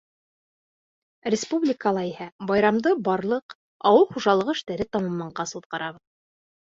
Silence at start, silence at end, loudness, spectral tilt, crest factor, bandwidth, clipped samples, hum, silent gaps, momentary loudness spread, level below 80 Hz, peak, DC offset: 1.25 s; 0.75 s; -24 LUFS; -5 dB/octave; 20 dB; 7.8 kHz; under 0.1%; none; 2.32-2.39 s, 3.42-3.49 s, 3.55-3.80 s, 5.66-5.70 s; 13 LU; -62 dBFS; -6 dBFS; under 0.1%